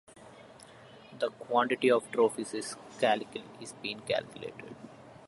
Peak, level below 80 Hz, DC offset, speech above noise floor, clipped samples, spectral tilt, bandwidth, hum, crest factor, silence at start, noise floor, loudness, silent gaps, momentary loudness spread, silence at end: -12 dBFS; -74 dBFS; under 0.1%; 22 dB; under 0.1%; -4 dB/octave; 11.5 kHz; none; 20 dB; 0.2 s; -53 dBFS; -31 LUFS; none; 25 LU; 0 s